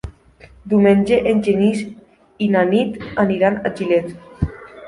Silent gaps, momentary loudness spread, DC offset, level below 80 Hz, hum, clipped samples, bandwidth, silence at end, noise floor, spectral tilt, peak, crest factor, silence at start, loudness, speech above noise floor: none; 12 LU; under 0.1%; -40 dBFS; none; under 0.1%; 11 kHz; 0 s; -46 dBFS; -7.5 dB/octave; -2 dBFS; 16 dB; 0.05 s; -17 LUFS; 30 dB